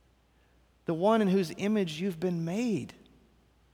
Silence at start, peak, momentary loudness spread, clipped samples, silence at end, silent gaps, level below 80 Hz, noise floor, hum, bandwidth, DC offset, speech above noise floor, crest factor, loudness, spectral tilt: 0.9 s; -14 dBFS; 10 LU; under 0.1%; 0.8 s; none; -66 dBFS; -65 dBFS; none; 16 kHz; under 0.1%; 37 dB; 18 dB; -30 LUFS; -6.5 dB/octave